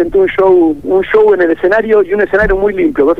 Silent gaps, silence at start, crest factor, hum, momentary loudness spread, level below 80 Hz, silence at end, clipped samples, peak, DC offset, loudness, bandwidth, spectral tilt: none; 0 s; 8 dB; none; 3 LU; -30 dBFS; 0 s; under 0.1%; 0 dBFS; 1%; -10 LUFS; 5 kHz; -8 dB/octave